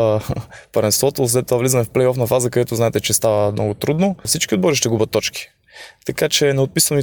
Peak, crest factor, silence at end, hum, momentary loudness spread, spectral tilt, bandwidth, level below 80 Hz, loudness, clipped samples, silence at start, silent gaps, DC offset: -2 dBFS; 16 dB; 0 s; none; 9 LU; -4 dB/octave; 19.5 kHz; -48 dBFS; -17 LUFS; under 0.1%; 0 s; none; under 0.1%